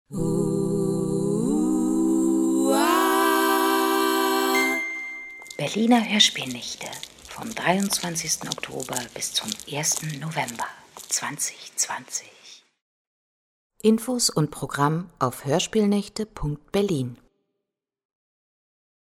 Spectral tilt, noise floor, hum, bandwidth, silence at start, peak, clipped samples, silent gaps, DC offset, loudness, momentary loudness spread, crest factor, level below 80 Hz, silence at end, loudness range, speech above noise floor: -3.5 dB/octave; -84 dBFS; none; 19 kHz; 0.1 s; -4 dBFS; under 0.1%; 12.82-13.70 s; under 0.1%; -23 LUFS; 12 LU; 22 dB; -52 dBFS; 2.05 s; 7 LU; 59 dB